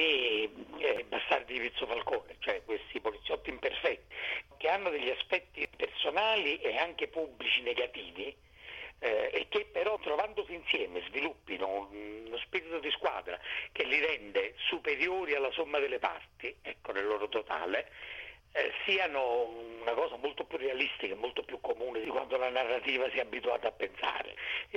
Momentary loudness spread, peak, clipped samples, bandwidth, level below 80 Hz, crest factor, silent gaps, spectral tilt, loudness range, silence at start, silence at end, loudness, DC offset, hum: 9 LU; -14 dBFS; under 0.1%; 8.2 kHz; -64 dBFS; 20 dB; none; -3.5 dB/octave; 3 LU; 0 s; 0 s; -34 LUFS; under 0.1%; none